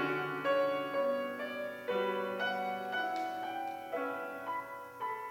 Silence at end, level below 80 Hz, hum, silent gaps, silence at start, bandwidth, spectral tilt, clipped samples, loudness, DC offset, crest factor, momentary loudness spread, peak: 0 s; -80 dBFS; none; none; 0 s; 17 kHz; -5 dB/octave; under 0.1%; -36 LUFS; under 0.1%; 16 dB; 8 LU; -20 dBFS